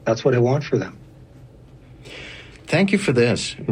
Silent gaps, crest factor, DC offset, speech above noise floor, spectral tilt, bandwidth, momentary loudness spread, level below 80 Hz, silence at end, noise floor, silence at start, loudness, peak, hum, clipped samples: none; 18 dB; under 0.1%; 26 dB; -6 dB/octave; 10.5 kHz; 19 LU; -52 dBFS; 0 s; -45 dBFS; 0.05 s; -20 LUFS; -4 dBFS; none; under 0.1%